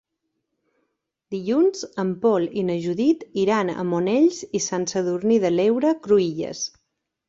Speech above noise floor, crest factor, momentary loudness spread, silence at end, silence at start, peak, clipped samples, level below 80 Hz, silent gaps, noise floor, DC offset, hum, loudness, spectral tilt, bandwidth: 56 dB; 16 dB; 8 LU; 0.6 s; 1.3 s; -6 dBFS; under 0.1%; -64 dBFS; none; -77 dBFS; under 0.1%; none; -22 LUFS; -5.5 dB/octave; 7.8 kHz